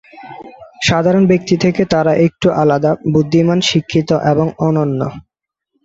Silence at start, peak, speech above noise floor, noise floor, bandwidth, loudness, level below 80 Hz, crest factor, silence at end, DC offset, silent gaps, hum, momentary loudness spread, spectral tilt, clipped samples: 0.15 s; 0 dBFS; 56 dB; -69 dBFS; 8 kHz; -14 LUFS; -46 dBFS; 14 dB; 0.65 s; under 0.1%; none; none; 9 LU; -6 dB/octave; under 0.1%